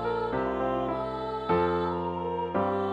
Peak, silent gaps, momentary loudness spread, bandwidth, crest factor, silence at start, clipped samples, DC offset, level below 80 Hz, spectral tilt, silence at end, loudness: -14 dBFS; none; 5 LU; 8.2 kHz; 14 dB; 0 s; under 0.1%; under 0.1%; -50 dBFS; -8.5 dB/octave; 0 s; -29 LUFS